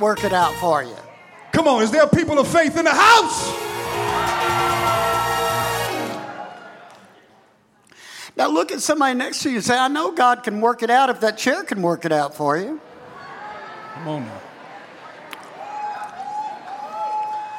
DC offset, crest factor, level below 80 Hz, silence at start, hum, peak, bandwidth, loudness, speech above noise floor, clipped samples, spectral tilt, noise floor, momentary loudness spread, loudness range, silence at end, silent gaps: under 0.1%; 18 dB; -52 dBFS; 0 s; none; -4 dBFS; 17 kHz; -19 LUFS; 38 dB; under 0.1%; -4 dB/octave; -56 dBFS; 21 LU; 15 LU; 0 s; none